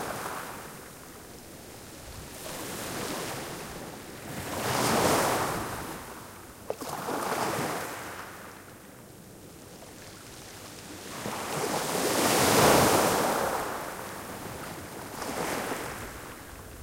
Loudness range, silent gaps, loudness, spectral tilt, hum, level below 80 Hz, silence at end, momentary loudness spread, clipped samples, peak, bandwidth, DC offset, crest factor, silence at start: 13 LU; none; -29 LUFS; -3 dB/octave; none; -54 dBFS; 0 s; 21 LU; under 0.1%; -8 dBFS; 16 kHz; under 0.1%; 24 dB; 0 s